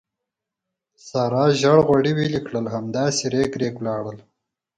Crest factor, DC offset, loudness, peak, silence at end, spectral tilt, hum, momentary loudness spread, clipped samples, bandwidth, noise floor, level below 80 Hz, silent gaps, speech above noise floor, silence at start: 20 dB; under 0.1%; -21 LUFS; -2 dBFS; 0.55 s; -5.5 dB/octave; none; 11 LU; under 0.1%; 9.6 kHz; -84 dBFS; -56 dBFS; none; 64 dB; 1.05 s